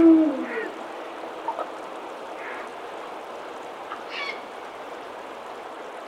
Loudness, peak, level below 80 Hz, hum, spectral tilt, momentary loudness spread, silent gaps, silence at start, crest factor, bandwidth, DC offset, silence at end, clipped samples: -30 LUFS; -8 dBFS; -72 dBFS; none; -4.5 dB/octave; 9 LU; none; 0 s; 20 dB; 9.8 kHz; under 0.1%; 0 s; under 0.1%